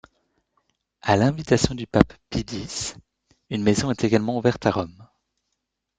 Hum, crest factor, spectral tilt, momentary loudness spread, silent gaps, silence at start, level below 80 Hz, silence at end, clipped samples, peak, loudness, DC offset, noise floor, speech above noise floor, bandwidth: none; 22 dB; -5.5 dB/octave; 10 LU; none; 1.05 s; -46 dBFS; 0.95 s; under 0.1%; -2 dBFS; -23 LUFS; under 0.1%; -79 dBFS; 57 dB; 9.6 kHz